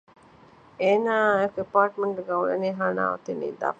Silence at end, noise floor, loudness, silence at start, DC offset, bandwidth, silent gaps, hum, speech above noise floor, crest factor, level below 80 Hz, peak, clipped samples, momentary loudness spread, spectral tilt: 0.05 s; -53 dBFS; -25 LUFS; 0.8 s; under 0.1%; 8 kHz; none; none; 29 dB; 18 dB; -68 dBFS; -6 dBFS; under 0.1%; 7 LU; -6.5 dB/octave